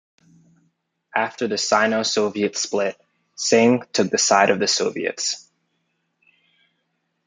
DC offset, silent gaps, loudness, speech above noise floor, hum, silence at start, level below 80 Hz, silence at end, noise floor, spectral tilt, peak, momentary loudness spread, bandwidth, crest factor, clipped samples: under 0.1%; none; -20 LUFS; 53 dB; none; 1.15 s; -72 dBFS; 1.85 s; -73 dBFS; -2.5 dB/octave; -2 dBFS; 9 LU; 10 kHz; 20 dB; under 0.1%